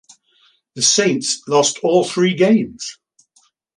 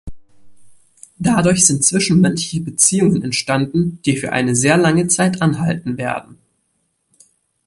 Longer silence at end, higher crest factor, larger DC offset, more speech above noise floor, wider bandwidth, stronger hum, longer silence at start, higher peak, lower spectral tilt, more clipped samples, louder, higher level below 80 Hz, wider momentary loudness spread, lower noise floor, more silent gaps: second, 0.85 s vs 1.35 s; about the same, 16 dB vs 18 dB; neither; second, 43 dB vs 52 dB; about the same, 11.5 kHz vs 11.5 kHz; neither; first, 0.75 s vs 0.05 s; about the same, -2 dBFS vs 0 dBFS; about the same, -3.5 dB/octave vs -4 dB/octave; neither; about the same, -16 LUFS vs -15 LUFS; second, -62 dBFS vs -46 dBFS; about the same, 11 LU vs 10 LU; second, -59 dBFS vs -67 dBFS; neither